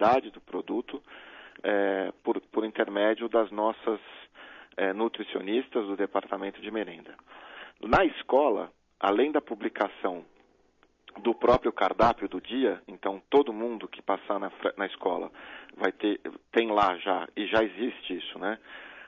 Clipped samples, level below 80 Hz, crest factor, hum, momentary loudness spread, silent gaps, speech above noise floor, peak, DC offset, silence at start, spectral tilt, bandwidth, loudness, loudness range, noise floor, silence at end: under 0.1%; -56 dBFS; 20 dB; none; 18 LU; none; 37 dB; -10 dBFS; under 0.1%; 0 s; -6.5 dB/octave; 7.2 kHz; -29 LUFS; 4 LU; -65 dBFS; 0 s